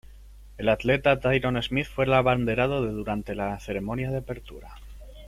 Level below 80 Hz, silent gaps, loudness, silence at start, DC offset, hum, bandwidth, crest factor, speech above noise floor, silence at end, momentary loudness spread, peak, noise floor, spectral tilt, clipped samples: -44 dBFS; none; -25 LUFS; 0.1 s; under 0.1%; none; 14.5 kHz; 18 dB; 21 dB; 0 s; 11 LU; -8 dBFS; -47 dBFS; -7 dB/octave; under 0.1%